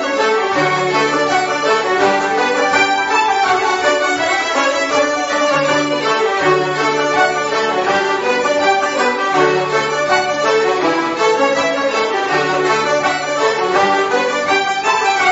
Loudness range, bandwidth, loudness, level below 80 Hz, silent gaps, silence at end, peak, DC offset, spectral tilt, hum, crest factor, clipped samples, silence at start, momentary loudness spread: 1 LU; 8 kHz; -14 LUFS; -56 dBFS; none; 0 s; 0 dBFS; under 0.1%; -3 dB/octave; none; 14 dB; under 0.1%; 0 s; 2 LU